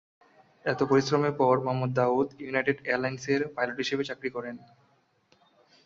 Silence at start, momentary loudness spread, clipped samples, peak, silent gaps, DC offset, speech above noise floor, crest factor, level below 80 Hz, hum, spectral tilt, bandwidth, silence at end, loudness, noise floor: 0.65 s; 10 LU; under 0.1%; -10 dBFS; none; under 0.1%; 40 dB; 20 dB; -68 dBFS; none; -6 dB/octave; 7.6 kHz; 1.2 s; -28 LUFS; -67 dBFS